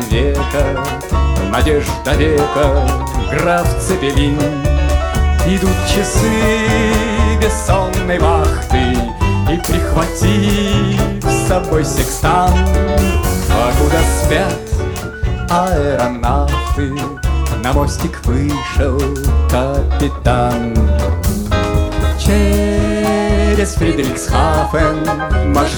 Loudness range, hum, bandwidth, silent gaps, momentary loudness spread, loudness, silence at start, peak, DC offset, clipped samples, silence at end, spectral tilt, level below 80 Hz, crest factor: 2 LU; none; over 20 kHz; none; 4 LU; -15 LUFS; 0 s; 0 dBFS; under 0.1%; under 0.1%; 0 s; -5.5 dB/octave; -18 dBFS; 12 dB